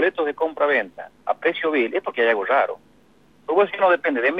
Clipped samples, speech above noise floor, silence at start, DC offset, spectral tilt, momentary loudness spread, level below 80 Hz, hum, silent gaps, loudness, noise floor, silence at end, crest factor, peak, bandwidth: under 0.1%; 35 dB; 0 s; under 0.1%; -6 dB/octave; 11 LU; -70 dBFS; 50 Hz at -65 dBFS; none; -21 LUFS; -56 dBFS; 0 s; 16 dB; -6 dBFS; 5.8 kHz